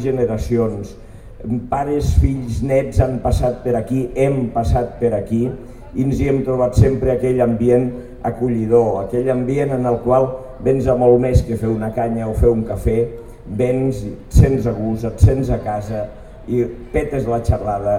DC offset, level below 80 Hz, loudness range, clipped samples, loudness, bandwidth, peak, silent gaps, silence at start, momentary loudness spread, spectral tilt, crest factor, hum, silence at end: 0.4%; -26 dBFS; 3 LU; under 0.1%; -18 LUFS; 15.5 kHz; 0 dBFS; none; 0 s; 10 LU; -8.5 dB/octave; 16 dB; none; 0 s